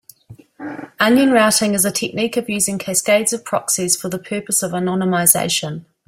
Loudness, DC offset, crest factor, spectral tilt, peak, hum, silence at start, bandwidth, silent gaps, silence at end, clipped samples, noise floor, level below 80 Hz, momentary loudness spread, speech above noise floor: -16 LUFS; under 0.1%; 18 dB; -3 dB/octave; 0 dBFS; none; 0.3 s; 16.5 kHz; none; 0.25 s; under 0.1%; -44 dBFS; -58 dBFS; 12 LU; 26 dB